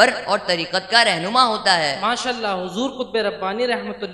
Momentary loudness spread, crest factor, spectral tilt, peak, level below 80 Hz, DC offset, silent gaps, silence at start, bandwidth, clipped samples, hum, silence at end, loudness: 9 LU; 20 dB; -2.5 dB/octave; 0 dBFS; -60 dBFS; under 0.1%; none; 0 s; 12 kHz; under 0.1%; none; 0 s; -19 LUFS